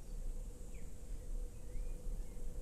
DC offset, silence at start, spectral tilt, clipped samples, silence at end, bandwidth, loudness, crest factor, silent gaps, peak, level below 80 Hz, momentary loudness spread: under 0.1%; 0 s; -6 dB/octave; under 0.1%; 0 s; 13.5 kHz; -51 LUFS; 12 dB; none; -30 dBFS; -44 dBFS; 4 LU